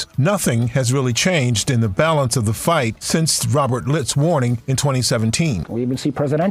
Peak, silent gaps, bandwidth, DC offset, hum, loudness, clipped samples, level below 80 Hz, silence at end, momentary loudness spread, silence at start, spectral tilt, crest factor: -4 dBFS; none; 16 kHz; under 0.1%; none; -18 LUFS; under 0.1%; -46 dBFS; 0 s; 3 LU; 0 s; -5 dB/octave; 14 dB